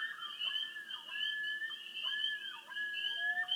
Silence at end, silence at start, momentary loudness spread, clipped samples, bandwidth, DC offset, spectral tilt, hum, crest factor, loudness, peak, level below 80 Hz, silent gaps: 0 s; 0 s; 7 LU; under 0.1%; 19 kHz; under 0.1%; 1.5 dB/octave; none; 14 dB; -37 LUFS; -24 dBFS; under -90 dBFS; none